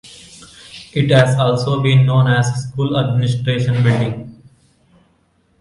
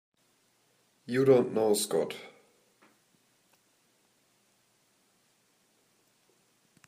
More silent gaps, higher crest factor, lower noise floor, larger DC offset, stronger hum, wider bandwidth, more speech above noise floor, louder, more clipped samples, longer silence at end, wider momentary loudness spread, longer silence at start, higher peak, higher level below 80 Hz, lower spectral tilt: neither; second, 16 dB vs 24 dB; second, -59 dBFS vs -71 dBFS; neither; neither; second, 11.5 kHz vs 15.5 kHz; about the same, 44 dB vs 44 dB; first, -15 LUFS vs -27 LUFS; neither; second, 1.3 s vs 4.6 s; second, 18 LU vs 24 LU; second, 0.05 s vs 1.1 s; first, 0 dBFS vs -10 dBFS; first, -48 dBFS vs -82 dBFS; first, -6.5 dB/octave vs -5 dB/octave